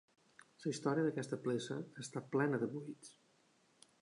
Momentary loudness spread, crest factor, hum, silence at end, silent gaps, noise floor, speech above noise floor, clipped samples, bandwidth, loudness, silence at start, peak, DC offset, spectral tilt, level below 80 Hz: 13 LU; 20 dB; none; 0.9 s; none; -73 dBFS; 34 dB; under 0.1%; 11 kHz; -40 LUFS; 0.6 s; -22 dBFS; under 0.1%; -6 dB/octave; -86 dBFS